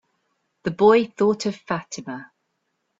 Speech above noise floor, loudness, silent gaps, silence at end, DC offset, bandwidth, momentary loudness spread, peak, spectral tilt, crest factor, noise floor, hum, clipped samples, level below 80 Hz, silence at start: 54 dB; -21 LUFS; none; 0.75 s; under 0.1%; 8 kHz; 17 LU; -4 dBFS; -5.5 dB/octave; 20 dB; -75 dBFS; none; under 0.1%; -62 dBFS; 0.65 s